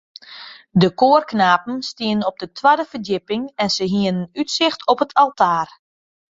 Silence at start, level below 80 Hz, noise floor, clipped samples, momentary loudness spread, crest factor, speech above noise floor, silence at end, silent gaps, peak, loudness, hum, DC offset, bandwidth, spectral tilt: 0.3 s; -60 dBFS; -40 dBFS; under 0.1%; 11 LU; 18 dB; 22 dB; 0.75 s; none; -2 dBFS; -18 LUFS; none; under 0.1%; 7.8 kHz; -5 dB/octave